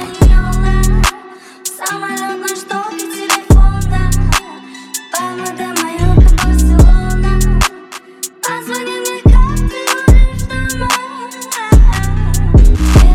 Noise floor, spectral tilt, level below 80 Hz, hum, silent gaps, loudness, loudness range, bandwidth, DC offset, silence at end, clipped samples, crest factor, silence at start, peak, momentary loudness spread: -34 dBFS; -5 dB/octave; -12 dBFS; none; none; -13 LUFS; 3 LU; 16 kHz; under 0.1%; 0 s; under 0.1%; 10 dB; 0 s; 0 dBFS; 13 LU